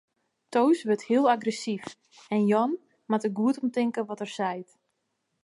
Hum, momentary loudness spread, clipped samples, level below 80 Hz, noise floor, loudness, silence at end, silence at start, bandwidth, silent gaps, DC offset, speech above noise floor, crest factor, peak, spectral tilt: none; 11 LU; under 0.1%; -80 dBFS; -78 dBFS; -27 LUFS; 0.8 s; 0.5 s; 11.5 kHz; none; under 0.1%; 52 dB; 16 dB; -10 dBFS; -6 dB/octave